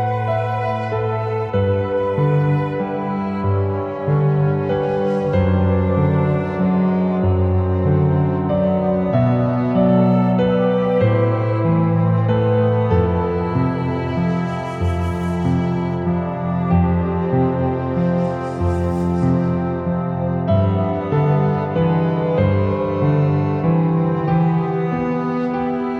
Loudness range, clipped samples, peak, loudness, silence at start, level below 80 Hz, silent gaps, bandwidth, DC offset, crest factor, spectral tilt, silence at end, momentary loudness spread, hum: 3 LU; under 0.1%; -4 dBFS; -18 LUFS; 0 s; -44 dBFS; none; 6.4 kHz; under 0.1%; 14 dB; -10 dB/octave; 0 s; 5 LU; none